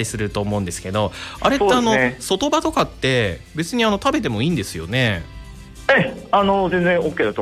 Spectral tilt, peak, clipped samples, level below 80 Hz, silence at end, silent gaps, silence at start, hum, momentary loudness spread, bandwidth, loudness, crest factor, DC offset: -5 dB/octave; -4 dBFS; under 0.1%; -40 dBFS; 0 s; none; 0 s; none; 8 LU; 15.5 kHz; -19 LUFS; 14 dB; under 0.1%